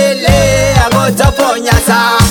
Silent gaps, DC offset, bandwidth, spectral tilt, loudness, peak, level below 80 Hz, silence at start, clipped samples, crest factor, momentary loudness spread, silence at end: none; under 0.1%; 19.5 kHz; -4.5 dB/octave; -9 LUFS; 0 dBFS; -18 dBFS; 0 s; 0.5%; 8 dB; 2 LU; 0 s